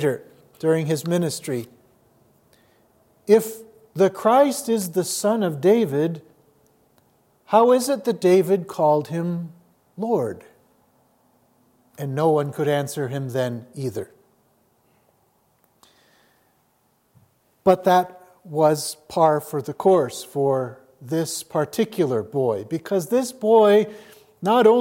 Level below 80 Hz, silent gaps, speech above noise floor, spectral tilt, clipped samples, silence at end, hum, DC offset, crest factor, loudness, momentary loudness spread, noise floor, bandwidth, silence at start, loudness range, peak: -70 dBFS; none; 45 dB; -5.5 dB/octave; under 0.1%; 0 s; none; under 0.1%; 20 dB; -21 LUFS; 14 LU; -65 dBFS; 17 kHz; 0 s; 8 LU; -2 dBFS